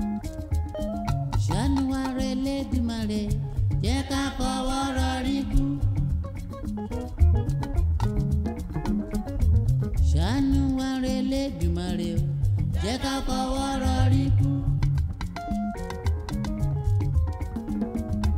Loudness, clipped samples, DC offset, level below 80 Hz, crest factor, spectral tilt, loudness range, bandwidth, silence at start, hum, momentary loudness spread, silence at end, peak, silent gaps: -27 LUFS; under 0.1%; under 0.1%; -30 dBFS; 16 dB; -6.5 dB/octave; 2 LU; 14.5 kHz; 0 s; none; 8 LU; 0 s; -8 dBFS; none